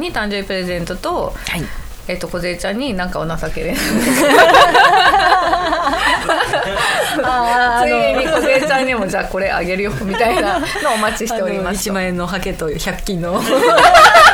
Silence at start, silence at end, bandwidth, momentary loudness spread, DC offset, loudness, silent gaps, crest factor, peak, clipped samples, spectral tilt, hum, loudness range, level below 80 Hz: 0 s; 0 s; over 20 kHz; 14 LU; under 0.1%; -14 LUFS; none; 14 dB; 0 dBFS; under 0.1%; -3.5 dB/octave; none; 9 LU; -32 dBFS